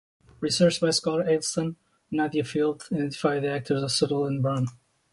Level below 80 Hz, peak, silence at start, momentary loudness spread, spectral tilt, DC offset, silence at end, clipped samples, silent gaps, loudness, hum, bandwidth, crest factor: -62 dBFS; -8 dBFS; 0.4 s; 8 LU; -5 dB/octave; under 0.1%; 0.4 s; under 0.1%; none; -26 LUFS; none; 11.5 kHz; 18 dB